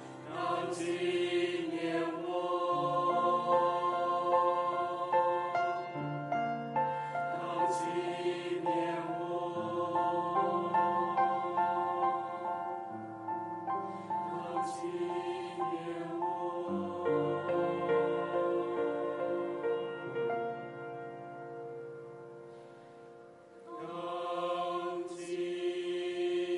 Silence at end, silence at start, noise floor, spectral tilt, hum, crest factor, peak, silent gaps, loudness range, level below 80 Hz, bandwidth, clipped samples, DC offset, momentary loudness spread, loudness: 0 s; 0 s; -54 dBFS; -6 dB/octave; none; 16 dB; -18 dBFS; none; 9 LU; -80 dBFS; 11.5 kHz; under 0.1%; under 0.1%; 13 LU; -34 LUFS